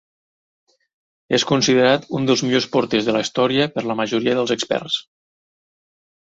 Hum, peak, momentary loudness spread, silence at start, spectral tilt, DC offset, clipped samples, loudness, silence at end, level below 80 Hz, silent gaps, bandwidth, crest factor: none; -2 dBFS; 6 LU; 1.3 s; -4 dB/octave; under 0.1%; under 0.1%; -19 LUFS; 1.2 s; -60 dBFS; none; 8 kHz; 18 dB